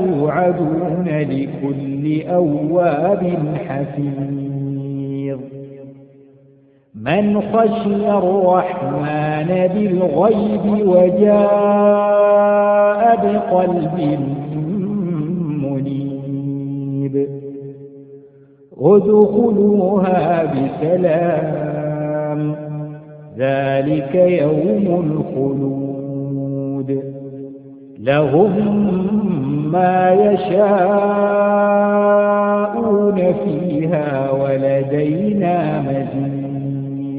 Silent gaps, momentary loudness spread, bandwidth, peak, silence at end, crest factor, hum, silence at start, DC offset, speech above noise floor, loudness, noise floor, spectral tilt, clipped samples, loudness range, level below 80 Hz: none; 11 LU; 4.7 kHz; 0 dBFS; 0 s; 16 dB; none; 0 s; under 0.1%; 35 dB; -16 LUFS; -50 dBFS; -13 dB/octave; under 0.1%; 8 LU; -52 dBFS